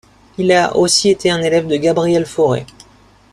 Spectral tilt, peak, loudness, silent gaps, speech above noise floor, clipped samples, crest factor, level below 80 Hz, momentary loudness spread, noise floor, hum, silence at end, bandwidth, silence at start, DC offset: -4 dB/octave; 0 dBFS; -14 LUFS; none; 33 dB; under 0.1%; 16 dB; -50 dBFS; 6 LU; -47 dBFS; none; 0.7 s; 13.5 kHz; 0.4 s; under 0.1%